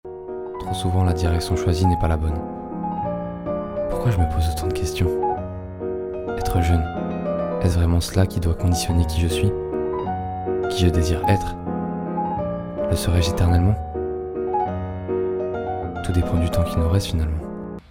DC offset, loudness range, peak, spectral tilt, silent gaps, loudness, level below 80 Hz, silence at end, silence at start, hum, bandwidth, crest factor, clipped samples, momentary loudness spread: under 0.1%; 2 LU; -4 dBFS; -6.5 dB/octave; none; -23 LUFS; -34 dBFS; 0.1 s; 0.05 s; none; 16 kHz; 18 dB; under 0.1%; 9 LU